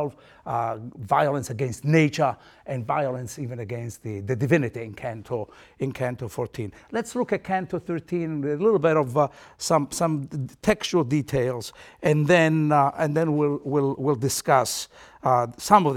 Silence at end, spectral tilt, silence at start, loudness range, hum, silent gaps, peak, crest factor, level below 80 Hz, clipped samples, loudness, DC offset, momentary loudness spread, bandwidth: 0 s; -5.5 dB/octave; 0 s; 6 LU; none; none; -2 dBFS; 22 dB; -56 dBFS; under 0.1%; -24 LUFS; under 0.1%; 14 LU; 16.5 kHz